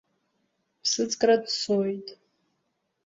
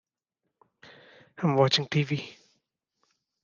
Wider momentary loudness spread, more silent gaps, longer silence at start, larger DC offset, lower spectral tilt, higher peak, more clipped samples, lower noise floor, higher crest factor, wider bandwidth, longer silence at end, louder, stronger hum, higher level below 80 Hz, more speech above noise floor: about the same, 12 LU vs 11 LU; neither; second, 0.85 s vs 1.4 s; neither; second, -3 dB/octave vs -5.5 dB/octave; about the same, -10 dBFS vs -8 dBFS; neither; second, -77 dBFS vs -84 dBFS; about the same, 20 dB vs 22 dB; about the same, 8 kHz vs 7.4 kHz; second, 0.9 s vs 1.1 s; about the same, -25 LUFS vs -26 LUFS; neither; about the same, -72 dBFS vs -74 dBFS; second, 52 dB vs 59 dB